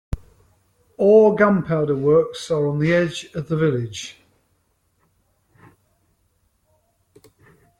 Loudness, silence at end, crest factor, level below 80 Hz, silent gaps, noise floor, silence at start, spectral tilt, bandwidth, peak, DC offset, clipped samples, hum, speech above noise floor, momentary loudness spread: -19 LUFS; 3.7 s; 18 dB; -46 dBFS; none; -66 dBFS; 0.1 s; -6.5 dB/octave; 11.5 kHz; -4 dBFS; under 0.1%; under 0.1%; none; 48 dB; 18 LU